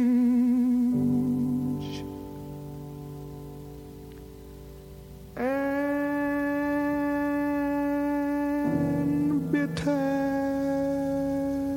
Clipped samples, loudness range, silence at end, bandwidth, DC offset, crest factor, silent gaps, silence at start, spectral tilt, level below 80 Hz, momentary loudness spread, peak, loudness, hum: under 0.1%; 11 LU; 0 s; 17 kHz; under 0.1%; 14 dB; none; 0 s; -7.5 dB/octave; -52 dBFS; 20 LU; -14 dBFS; -27 LUFS; none